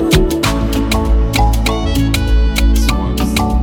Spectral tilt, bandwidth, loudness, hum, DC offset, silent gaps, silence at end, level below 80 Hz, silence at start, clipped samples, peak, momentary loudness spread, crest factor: -5.5 dB/octave; 17.5 kHz; -14 LUFS; none; under 0.1%; none; 0 s; -14 dBFS; 0 s; under 0.1%; 0 dBFS; 3 LU; 12 dB